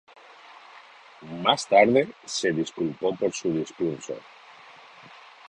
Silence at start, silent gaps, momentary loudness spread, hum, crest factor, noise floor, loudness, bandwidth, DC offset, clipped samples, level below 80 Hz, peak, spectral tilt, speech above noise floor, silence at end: 0.5 s; none; 21 LU; none; 24 dB; -49 dBFS; -24 LUFS; 11 kHz; under 0.1%; under 0.1%; -66 dBFS; -4 dBFS; -4 dB/octave; 25 dB; 0.45 s